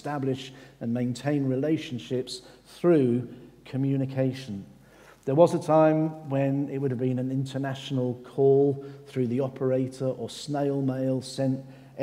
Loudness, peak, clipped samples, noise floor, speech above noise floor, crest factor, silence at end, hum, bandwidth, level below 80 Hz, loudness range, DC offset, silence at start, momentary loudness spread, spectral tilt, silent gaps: -27 LUFS; -6 dBFS; under 0.1%; -53 dBFS; 27 dB; 20 dB; 0 s; none; 13.5 kHz; -68 dBFS; 3 LU; under 0.1%; 0.05 s; 15 LU; -7.5 dB/octave; none